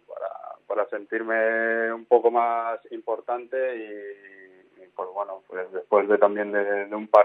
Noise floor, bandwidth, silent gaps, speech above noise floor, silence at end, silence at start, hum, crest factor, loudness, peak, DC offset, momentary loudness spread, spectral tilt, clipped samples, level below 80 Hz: -53 dBFS; 5 kHz; none; 29 dB; 0 s; 0.1 s; none; 24 dB; -25 LUFS; 0 dBFS; under 0.1%; 16 LU; -7 dB/octave; under 0.1%; -84 dBFS